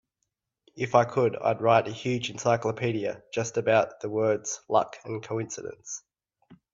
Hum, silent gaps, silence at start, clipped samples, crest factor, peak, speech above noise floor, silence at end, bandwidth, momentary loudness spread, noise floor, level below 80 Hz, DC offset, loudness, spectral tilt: none; none; 0.75 s; under 0.1%; 22 dB; -6 dBFS; 55 dB; 0.2 s; 7.8 kHz; 14 LU; -82 dBFS; -66 dBFS; under 0.1%; -27 LUFS; -5 dB/octave